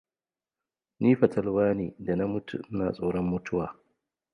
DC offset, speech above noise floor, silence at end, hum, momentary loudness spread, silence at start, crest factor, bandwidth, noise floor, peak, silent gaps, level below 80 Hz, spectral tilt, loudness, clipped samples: under 0.1%; over 63 dB; 0.6 s; none; 9 LU; 1 s; 22 dB; 6.8 kHz; under -90 dBFS; -8 dBFS; none; -56 dBFS; -9 dB/octave; -28 LUFS; under 0.1%